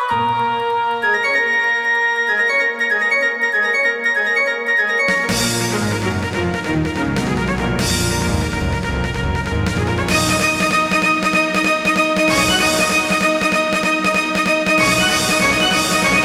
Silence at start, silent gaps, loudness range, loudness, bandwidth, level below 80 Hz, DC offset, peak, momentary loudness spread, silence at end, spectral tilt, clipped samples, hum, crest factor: 0 s; none; 4 LU; -16 LUFS; 16.5 kHz; -34 dBFS; under 0.1%; -2 dBFS; 6 LU; 0 s; -3.5 dB/octave; under 0.1%; none; 14 dB